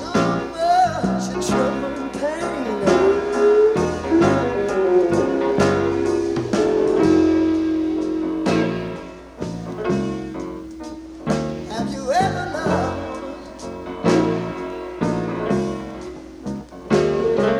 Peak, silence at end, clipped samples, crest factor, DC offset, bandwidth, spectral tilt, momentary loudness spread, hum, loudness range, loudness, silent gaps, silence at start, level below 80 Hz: -2 dBFS; 0 s; under 0.1%; 18 dB; under 0.1%; 12 kHz; -6 dB/octave; 15 LU; none; 7 LU; -20 LUFS; none; 0 s; -44 dBFS